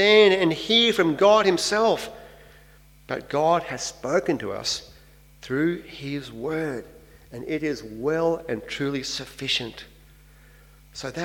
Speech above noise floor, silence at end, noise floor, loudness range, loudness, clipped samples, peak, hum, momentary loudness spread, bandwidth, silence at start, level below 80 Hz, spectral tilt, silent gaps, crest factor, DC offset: 29 dB; 0 s; -52 dBFS; 8 LU; -23 LUFS; under 0.1%; -4 dBFS; none; 16 LU; 17 kHz; 0 s; -54 dBFS; -4 dB/octave; none; 20 dB; under 0.1%